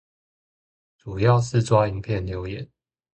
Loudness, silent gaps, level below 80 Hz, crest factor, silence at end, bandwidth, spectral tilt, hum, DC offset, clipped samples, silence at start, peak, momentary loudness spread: -22 LUFS; none; -46 dBFS; 20 dB; 0.5 s; 8.8 kHz; -7 dB/octave; none; under 0.1%; under 0.1%; 1.05 s; -4 dBFS; 17 LU